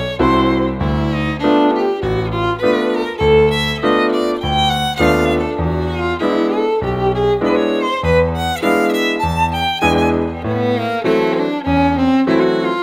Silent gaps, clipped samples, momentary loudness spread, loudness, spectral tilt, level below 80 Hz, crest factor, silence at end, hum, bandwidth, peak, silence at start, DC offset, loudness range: none; under 0.1%; 5 LU; -16 LUFS; -6 dB/octave; -32 dBFS; 14 dB; 0 s; none; 16 kHz; -2 dBFS; 0 s; under 0.1%; 1 LU